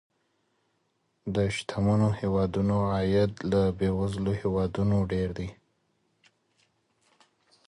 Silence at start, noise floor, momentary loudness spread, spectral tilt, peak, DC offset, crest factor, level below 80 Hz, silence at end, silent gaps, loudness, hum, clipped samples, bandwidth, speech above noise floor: 1.25 s; -74 dBFS; 7 LU; -7.5 dB/octave; -12 dBFS; under 0.1%; 16 dB; -46 dBFS; 2.15 s; none; -27 LUFS; none; under 0.1%; 11 kHz; 48 dB